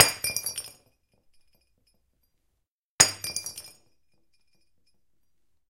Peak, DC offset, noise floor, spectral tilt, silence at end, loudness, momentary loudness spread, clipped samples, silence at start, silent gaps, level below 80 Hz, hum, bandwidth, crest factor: 0 dBFS; under 0.1%; -80 dBFS; 0 dB/octave; 2 s; -24 LUFS; 20 LU; under 0.1%; 0 s; 2.71-2.98 s; -62 dBFS; none; 16.5 kHz; 32 dB